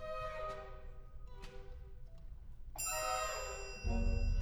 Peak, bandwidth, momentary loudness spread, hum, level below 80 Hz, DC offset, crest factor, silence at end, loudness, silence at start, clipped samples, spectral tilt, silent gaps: -24 dBFS; 18.5 kHz; 19 LU; none; -42 dBFS; under 0.1%; 16 dB; 0 s; -40 LUFS; 0 s; under 0.1%; -3.5 dB/octave; none